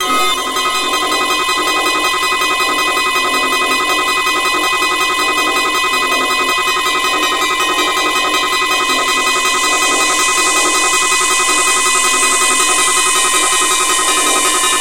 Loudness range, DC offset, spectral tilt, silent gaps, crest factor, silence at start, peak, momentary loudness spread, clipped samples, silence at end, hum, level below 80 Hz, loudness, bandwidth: 2 LU; under 0.1%; 0.5 dB/octave; none; 14 dB; 0 s; 0 dBFS; 3 LU; under 0.1%; 0 s; none; -44 dBFS; -12 LUFS; 17 kHz